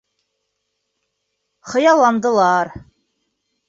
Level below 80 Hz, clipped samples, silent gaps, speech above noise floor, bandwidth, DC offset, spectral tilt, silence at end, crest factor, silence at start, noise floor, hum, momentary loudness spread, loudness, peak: -56 dBFS; under 0.1%; none; 59 dB; 7.8 kHz; under 0.1%; -4.5 dB/octave; 0.9 s; 18 dB; 1.65 s; -74 dBFS; none; 10 LU; -15 LUFS; -2 dBFS